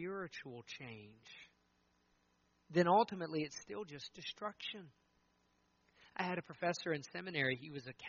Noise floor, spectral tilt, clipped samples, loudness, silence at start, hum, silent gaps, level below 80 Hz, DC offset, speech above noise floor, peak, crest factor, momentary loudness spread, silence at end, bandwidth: -77 dBFS; -3.5 dB/octave; under 0.1%; -40 LUFS; 0 s; 60 Hz at -70 dBFS; none; -80 dBFS; under 0.1%; 37 dB; -20 dBFS; 22 dB; 20 LU; 0 s; 7 kHz